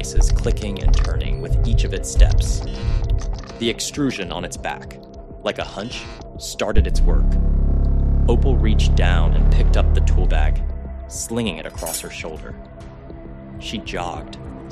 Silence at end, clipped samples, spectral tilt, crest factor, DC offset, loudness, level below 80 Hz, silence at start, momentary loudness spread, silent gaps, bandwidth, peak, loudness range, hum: 0 s; under 0.1%; -5.5 dB/octave; 18 dB; under 0.1%; -22 LUFS; -18 dBFS; 0 s; 17 LU; none; 13 kHz; 0 dBFS; 9 LU; none